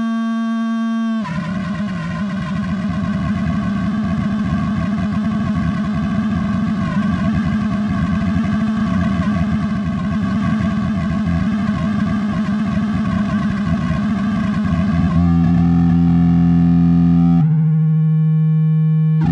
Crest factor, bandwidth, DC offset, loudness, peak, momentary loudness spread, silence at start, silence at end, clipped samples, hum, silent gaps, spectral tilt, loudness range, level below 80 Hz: 12 dB; 7.4 kHz; under 0.1%; -17 LUFS; -4 dBFS; 7 LU; 0 s; 0 s; under 0.1%; none; none; -8.5 dB/octave; 6 LU; -36 dBFS